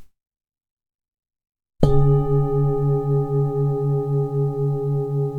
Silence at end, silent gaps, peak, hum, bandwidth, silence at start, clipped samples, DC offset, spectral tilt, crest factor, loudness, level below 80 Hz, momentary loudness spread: 0 s; 0.71-0.77 s, 0.95-0.99 s; 0 dBFS; none; 4.3 kHz; 0 s; under 0.1%; under 0.1%; -11 dB/octave; 20 dB; -21 LUFS; -34 dBFS; 5 LU